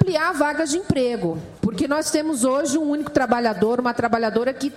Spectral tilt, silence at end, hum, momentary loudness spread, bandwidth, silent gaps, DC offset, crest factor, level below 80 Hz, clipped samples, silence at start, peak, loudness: -5 dB/octave; 0 s; none; 4 LU; 16 kHz; none; under 0.1%; 20 dB; -52 dBFS; under 0.1%; 0 s; -2 dBFS; -21 LUFS